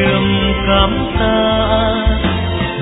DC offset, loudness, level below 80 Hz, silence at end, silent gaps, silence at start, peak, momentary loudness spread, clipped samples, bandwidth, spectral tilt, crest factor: under 0.1%; -14 LUFS; -22 dBFS; 0 s; none; 0 s; 0 dBFS; 4 LU; under 0.1%; 4 kHz; -9.5 dB/octave; 14 dB